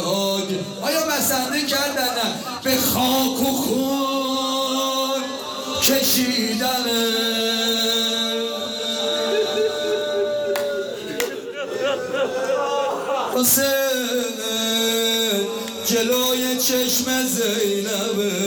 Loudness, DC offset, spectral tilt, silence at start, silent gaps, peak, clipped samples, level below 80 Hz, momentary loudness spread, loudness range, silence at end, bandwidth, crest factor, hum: -20 LUFS; under 0.1%; -2 dB/octave; 0 s; none; -2 dBFS; under 0.1%; -58 dBFS; 7 LU; 4 LU; 0 s; over 20 kHz; 18 dB; none